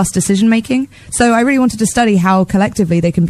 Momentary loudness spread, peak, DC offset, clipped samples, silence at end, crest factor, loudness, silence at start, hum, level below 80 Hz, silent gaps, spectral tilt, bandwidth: 4 LU; 0 dBFS; under 0.1%; under 0.1%; 0 s; 12 dB; -13 LUFS; 0 s; none; -38 dBFS; none; -5.5 dB/octave; 14 kHz